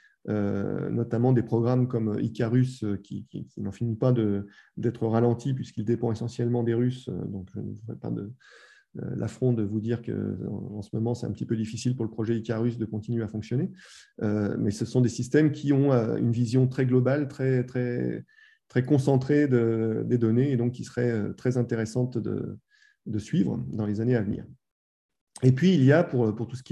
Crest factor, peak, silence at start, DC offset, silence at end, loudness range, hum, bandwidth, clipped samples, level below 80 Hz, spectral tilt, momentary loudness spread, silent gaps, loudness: 20 dB; -6 dBFS; 0.25 s; under 0.1%; 0.1 s; 6 LU; none; 9.8 kHz; under 0.1%; -58 dBFS; -8 dB/octave; 12 LU; 24.72-25.09 s, 25.21-25.27 s; -27 LUFS